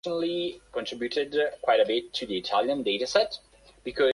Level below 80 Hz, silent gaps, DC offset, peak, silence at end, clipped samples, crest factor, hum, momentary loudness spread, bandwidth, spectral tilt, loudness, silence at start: -62 dBFS; none; under 0.1%; -8 dBFS; 0 s; under 0.1%; 20 dB; none; 11 LU; 11.5 kHz; -3.5 dB/octave; -27 LUFS; 0.05 s